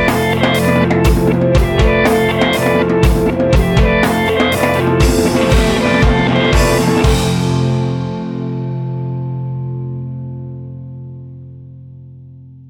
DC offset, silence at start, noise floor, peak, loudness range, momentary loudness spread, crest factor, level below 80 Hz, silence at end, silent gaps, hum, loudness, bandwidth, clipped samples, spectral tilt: under 0.1%; 0 s; -36 dBFS; 0 dBFS; 12 LU; 15 LU; 14 dB; -22 dBFS; 0.05 s; none; none; -14 LUFS; 19.5 kHz; under 0.1%; -6 dB/octave